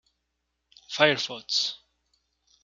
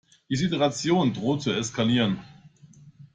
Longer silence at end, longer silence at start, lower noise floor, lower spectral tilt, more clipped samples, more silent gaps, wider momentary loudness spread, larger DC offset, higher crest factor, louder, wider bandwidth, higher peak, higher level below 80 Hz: first, 0.85 s vs 0.1 s; first, 0.9 s vs 0.3 s; first, -79 dBFS vs -52 dBFS; second, -2.5 dB/octave vs -5 dB/octave; neither; neither; first, 14 LU vs 5 LU; neither; first, 28 dB vs 16 dB; about the same, -25 LUFS vs -25 LUFS; second, 7.6 kHz vs 9.4 kHz; first, -2 dBFS vs -10 dBFS; second, -76 dBFS vs -60 dBFS